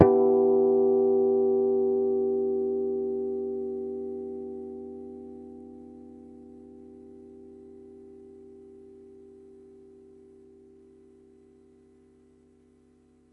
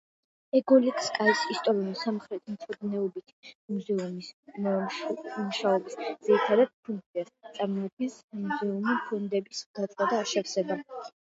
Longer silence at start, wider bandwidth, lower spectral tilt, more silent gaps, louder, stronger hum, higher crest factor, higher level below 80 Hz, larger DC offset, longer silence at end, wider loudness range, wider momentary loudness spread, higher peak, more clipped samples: second, 0 s vs 0.55 s; second, 2.5 kHz vs 8 kHz; first, -11.5 dB/octave vs -5 dB/octave; second, none vs 3.33-3.43 s, 3.55-3.68 s, 4.33-4.43 s, 6.74-6.83 s, 7.06-7.14 s, 7.93-7.97 s, 8.24-8.28 s, 9.66-9.74 s; first, -26 LUFS vs -29 LUFS; neither; first, 28 dB vs 20 dB; first, -64 dBFS vs -80 dBFS; neither; first, 4.55 s vs 0.15 s; first, 26 LU vs 6 LU; first, 27 LU vs 14 LU; first, 0 dBFS vs -10 dBFS; neither